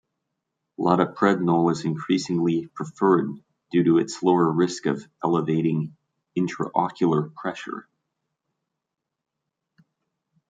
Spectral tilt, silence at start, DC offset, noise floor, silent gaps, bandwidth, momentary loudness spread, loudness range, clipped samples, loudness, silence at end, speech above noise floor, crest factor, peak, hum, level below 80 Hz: -6.5 dB/octave; 0.8 s; under 0.1%; -84 dBFS; none; 9.2 kHz; 12 LU; 7 LU; under 0.1%; -23 LUFS; 2.7 s; 61 dB; 20 dB; -4 dBFS; none; -68 dBFS